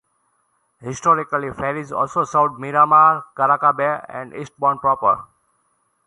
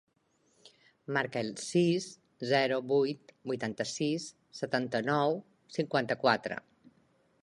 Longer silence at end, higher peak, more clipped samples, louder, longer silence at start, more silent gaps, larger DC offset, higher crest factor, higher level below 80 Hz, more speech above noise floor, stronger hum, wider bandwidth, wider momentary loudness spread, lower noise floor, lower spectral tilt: about the same, 0.8 s vs 0.85 s; first, -2 dBFS vs -10 dBFS; neither; first, -18 LUFS vs -32 LUFS; first, 0.8 s vs 0.65 s; neither; neither; about the same, 18 dB vs 22 dB; first, -58 dBFS vs -76 dBFS; first, 48 dB vs 41 dB; neither; about the same, 11 kHz vs 11.5 kHz; about the same, 15 LU vs 13 LU; second, -66 dBFS vs -72 dBFS; about the same, -6 dB/octave vs -5 dB/octave